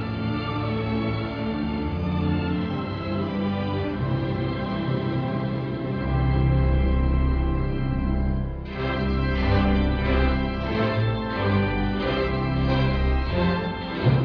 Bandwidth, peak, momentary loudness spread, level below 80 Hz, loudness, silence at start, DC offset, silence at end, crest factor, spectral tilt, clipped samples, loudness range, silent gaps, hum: 5.4 kHz; -8 dBFS; 5 LU; -28 dBFS; -25 LUFS; 0 s; under 0.1%; 0 s; 14 dB; -9 dB/octave; under 0.1%; 3 LU; none; none